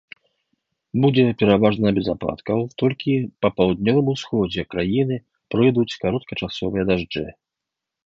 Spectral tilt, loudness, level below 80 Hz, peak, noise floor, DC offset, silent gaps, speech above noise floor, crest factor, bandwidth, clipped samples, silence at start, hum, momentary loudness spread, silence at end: -7.5 dB/octave; -21 LUFS; -48 dBFS; -2 dBFS; -84 dBFS; under 0.1%; none; 64 dB; 18 dB; 7.6 kHz; under 0.1%; 0.95 s; none; 10 LU; 0.75 s